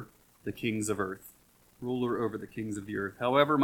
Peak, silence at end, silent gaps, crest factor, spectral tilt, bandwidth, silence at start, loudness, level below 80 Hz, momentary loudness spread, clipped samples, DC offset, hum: -10 dBFS; 0 s; none; 22 dB; -5 dB/octave; 19 kHz; 0 s; -33 LUFS; -64 dBFS; 15 LU; under 0.1%; under 0.1%; none